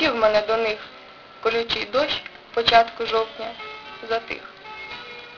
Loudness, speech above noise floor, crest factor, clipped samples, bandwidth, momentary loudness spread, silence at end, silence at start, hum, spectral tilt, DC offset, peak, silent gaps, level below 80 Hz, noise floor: -22 LUFS; 22 dB; 22 dB; under 0.1%; 7 kHz; 19 LU; 0 s; 0 s; none; 0 dB/octave; under 0.1%; -2 dBFS; none; -54 dBFS; -44 dBFS